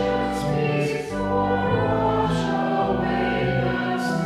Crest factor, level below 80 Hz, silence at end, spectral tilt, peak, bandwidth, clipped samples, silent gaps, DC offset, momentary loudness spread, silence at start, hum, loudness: 14 dB; -42 dBFS; 0 s; -7 dB/octave; -10 dBFS; 14 kHz; under 0.1%; none; under 0.1%; 3 LU; 0 s; none; -23 LUFS